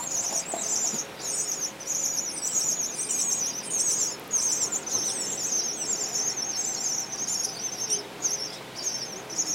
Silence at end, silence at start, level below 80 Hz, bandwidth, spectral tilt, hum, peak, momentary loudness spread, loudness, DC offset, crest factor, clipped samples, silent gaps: 0 s; 0 s; -66 dBFS; 16 kHz; 0 dB/octave; none; -12 dBFS; 6 LU; -26 LUFS; under 0.1%; 18 dB; under 0.1%; none